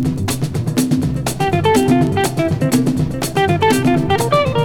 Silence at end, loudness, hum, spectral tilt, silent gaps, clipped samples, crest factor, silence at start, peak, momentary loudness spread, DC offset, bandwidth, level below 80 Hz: 0 s; -16 LUFS; none; -5.5 dB/octave; none; under 0.1%; 14 dB; 0 s; -2 dBFS; 5 LU; under 0.1%; 20 kHz; -38 dBFS